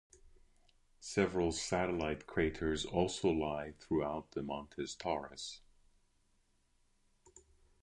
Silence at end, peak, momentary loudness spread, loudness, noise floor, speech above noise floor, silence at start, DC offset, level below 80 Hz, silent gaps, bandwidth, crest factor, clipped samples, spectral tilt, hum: 0.45 s; -18 dBFS; 11 LU; -37 LUFS; -74 dBFS; 38 dB; 0.25 s; under 0.1%; -56 dBFS; none; 11 kHz; 22 dB; under 0.1%; -5 dB/octave; none